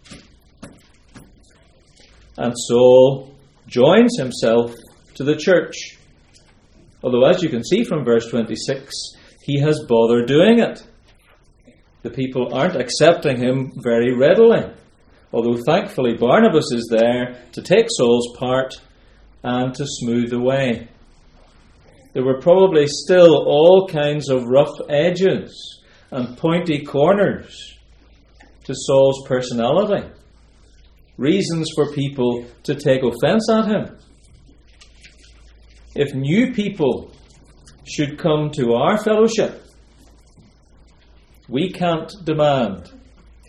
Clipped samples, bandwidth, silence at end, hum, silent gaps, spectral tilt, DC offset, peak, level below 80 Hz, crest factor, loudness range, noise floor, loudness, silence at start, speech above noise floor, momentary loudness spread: under 0.1%; 12 kHz; 0.65 s; none; none; -6 dB/octave; under 0.1%; 0 dBFS; -50 dBFS; 18 dB; 8 LU; -52 dBFS; -17 LUFS; 0.1 s; 36 dB; 16 LU